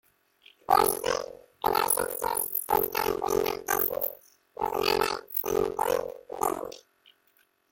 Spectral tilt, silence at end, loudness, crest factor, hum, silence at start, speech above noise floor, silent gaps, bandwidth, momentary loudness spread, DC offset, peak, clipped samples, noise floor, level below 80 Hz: -2.5 dB/octave; 0.9 s; -28 LUFS; 22 dB; none; 0.7 s; 40 dB; none; 17 kHz; 11 LU; under 0.1%; -8 dBFS; under 0.1%; -68 dBFS; -56 dBFS